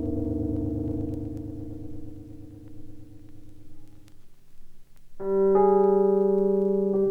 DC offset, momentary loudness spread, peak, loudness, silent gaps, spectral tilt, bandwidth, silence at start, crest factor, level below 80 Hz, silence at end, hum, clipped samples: under 0.1%; 24 LU; -10 dBFS; -24 LUFS; none; -11 dB/octave; 2.2 kHz; 0 s; 16 dB; -44 dBFS; 0 s; none; under 0.1%